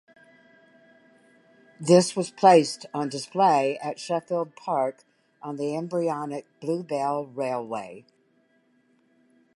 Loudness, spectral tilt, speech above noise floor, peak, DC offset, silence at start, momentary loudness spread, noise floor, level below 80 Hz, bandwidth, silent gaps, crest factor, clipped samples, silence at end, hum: -25 LUFS; -5 dB/octave; 41 dB; -4 dBFS; under 0.1%; 1.8 s; 15 LU; -65 dBFS; -80 dBFS; 11.5 kHz; none; 22 dB; under 0.1%; 1.55 s; none